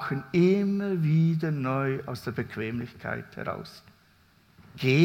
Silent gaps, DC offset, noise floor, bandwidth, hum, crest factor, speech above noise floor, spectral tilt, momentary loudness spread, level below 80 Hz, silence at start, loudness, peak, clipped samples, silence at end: none; under 0.1%; -61 dBFS; 15.5 kHz; none; 18 dB; 35 dB; -8 dB/octave; 12 LU; -64 dBFS; 0 s; -28 LUFS; -8 dBFS; under 0.1%; 0 s